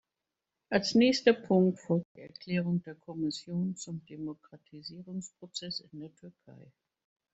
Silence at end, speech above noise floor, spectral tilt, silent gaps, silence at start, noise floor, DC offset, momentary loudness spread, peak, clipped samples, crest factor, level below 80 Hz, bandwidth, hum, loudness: 0.7 s; 57 dB; -5.5 dB/octave; 2.05-2.15 s; 0.7 s; -89 dBFS; under 0.1%; 22 LU; -8 dBFS; under 0.1%; 24 dB; -72 dBFS; 8.2 kHz; none; -31 LUFS